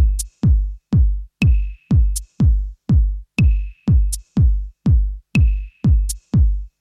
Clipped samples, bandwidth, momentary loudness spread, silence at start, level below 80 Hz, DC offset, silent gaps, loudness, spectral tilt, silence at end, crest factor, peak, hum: under 0.1%; 13.5 kHz; 4 LU; 0 s; -18 dBFS; under 0.1%; none; -19 LUFS; -6.5 dB/octave; 0.15 s; 10 dB; -6 dBFS; none